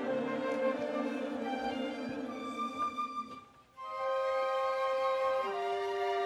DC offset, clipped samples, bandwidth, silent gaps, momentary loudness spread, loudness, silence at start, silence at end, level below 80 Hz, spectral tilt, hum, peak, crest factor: under 0.1%; under 0.1%; 12 kHz; none; 8 LU; -35 LUFS; 0 s; 0 s; -74 dBFS; -4.5 dB/octave; none; -22 dBFS; 14 dB